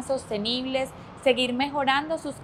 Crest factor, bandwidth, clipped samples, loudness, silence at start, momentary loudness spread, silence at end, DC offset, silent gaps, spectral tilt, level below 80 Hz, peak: 18 dB; 13.5 kHz; under 0.1%; -26 LUFS; 0 s; 7 LU; 0 s; under 0.1%; none; -4 dB/octave; -58 dBFS; -8 dBFS